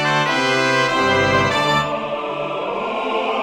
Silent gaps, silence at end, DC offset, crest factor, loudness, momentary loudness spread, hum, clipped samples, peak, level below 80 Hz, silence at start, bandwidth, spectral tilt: none; 0 s; under 0.1%; 16 dB; -18 LUFS; 8 LU; none; under 0.1%; -2 dBFS; -50 dBFS; 0 s; 16.5 kHz; -4 dB/octave